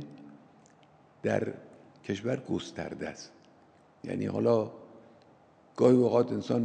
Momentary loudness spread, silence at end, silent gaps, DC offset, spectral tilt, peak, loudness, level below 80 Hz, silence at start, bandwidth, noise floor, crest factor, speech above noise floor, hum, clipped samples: 23 LU; 0 s; none; under 0.1%; -7 dB/octave; -10 dBFS; -30 LUFS; -70 dBFS; 0 s; 9.2 kHz; -60 dBFS; 22 dB; 32 dB; none; under 0.1%